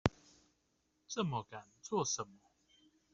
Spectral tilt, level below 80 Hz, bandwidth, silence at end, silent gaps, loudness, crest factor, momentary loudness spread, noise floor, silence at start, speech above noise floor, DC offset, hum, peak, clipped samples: -4 dB/octave; -62 dBFS; 8 kHz; 0.8 s; none; -40 LUFS; 32 dB; 14 LU; -79 dBFS; 0.05 s; 40 dB; under 0.1%; none; -10 dBFS; under 0.1%